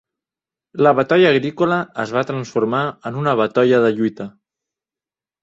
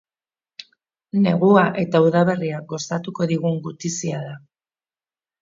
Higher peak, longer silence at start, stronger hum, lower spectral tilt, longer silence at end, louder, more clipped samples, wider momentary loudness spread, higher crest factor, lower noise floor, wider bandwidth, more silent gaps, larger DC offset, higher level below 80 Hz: about the same, -2 dBFS vs -2 dBFS; first, 0.75 s vs 0.6 s; neither; about the same, -7 dB/octave vs -6 dB/octave; about the same, 1.15 s vs 1.05 s; first, -17 LUFS vs -20 LUFS; neither; second, 10 LU vs 21 LU; about the same, 16 dB vs 20 dB; about the same, under -90 dBFS vs under -90 dBFS; about the same, 7.8 kHz vs 7.8 kHz; neither; neither; about the same, -62 dBFS vs -66 dBFS